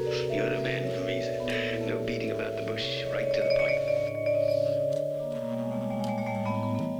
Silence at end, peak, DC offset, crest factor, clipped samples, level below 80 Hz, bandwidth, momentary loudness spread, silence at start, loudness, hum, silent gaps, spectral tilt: 0 s; -14 dBFS; under 0.1%; 14 dB; under 0.1%; -56 dBFS; 19.5 kHz; 6 LU; 0 s; -29 LUFS; none; none; -6 dB/octave